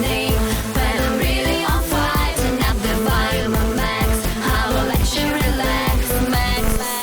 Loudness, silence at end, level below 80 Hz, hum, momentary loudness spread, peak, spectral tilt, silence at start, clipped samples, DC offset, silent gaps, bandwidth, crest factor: -19 LUFS; 0 s; -22 dBFS; none; 2 LU; -8 dBFS; -4.5 dB/octave; 0 s; under 0.1%; under 0.1%; none; over 20 kHz; 10 dB